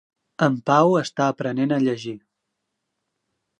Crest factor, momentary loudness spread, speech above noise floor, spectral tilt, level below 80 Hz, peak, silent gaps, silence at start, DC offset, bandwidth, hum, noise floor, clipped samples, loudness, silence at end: 20 dB; 13 LU; 58 dB; -6.5 dB/octave; -72 dBFS; -4 dBFS; none; 0.4 s; under 0.1%; 9.4 kHz; none; -79 dBFS; under 0.1%; -21 LUFS; 1.4 s